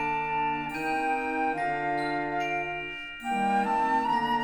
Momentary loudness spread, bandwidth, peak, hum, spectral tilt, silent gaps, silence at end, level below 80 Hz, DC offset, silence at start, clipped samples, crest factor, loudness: 6 LU; 18 kHz; -16 dBFS; none; -5 dB/octave; none; 0 s; -56 dBFS; under 0.1%; 0 s; under 0.1%; 12 dB; -28 LUFS